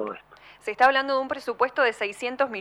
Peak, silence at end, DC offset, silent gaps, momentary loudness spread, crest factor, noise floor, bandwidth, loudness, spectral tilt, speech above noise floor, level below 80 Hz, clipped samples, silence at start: -6 dBFS; 0 s; under 0.1%; none; 15 LU; 18 dB; -49 dBFS; 13 kHz; -24 LUFS; -3 dB/octave; 24 dB; -66 dBFS; under 0.1%; 0 s